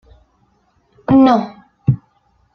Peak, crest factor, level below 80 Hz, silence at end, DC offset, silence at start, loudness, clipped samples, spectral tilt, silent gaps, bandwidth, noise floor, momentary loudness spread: -2 dBFS; 16 dB; -46 dBFS; 0.6 s; under 0.1%; 1.1 s; -15 LUFS; under 0.1%; -9 dB/octave; none; 6.4 kHz; -59 dBFS; 18 LU